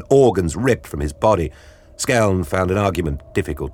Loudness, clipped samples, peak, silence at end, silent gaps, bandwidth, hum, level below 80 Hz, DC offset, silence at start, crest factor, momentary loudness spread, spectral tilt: -19 LUFS; under 0.1%; -2 dBFS; 0 s; none; 17 kHz; none; -34 dBFS; under 0.1%; 0 s; 16 dB; 9 LU; -6 dB/octave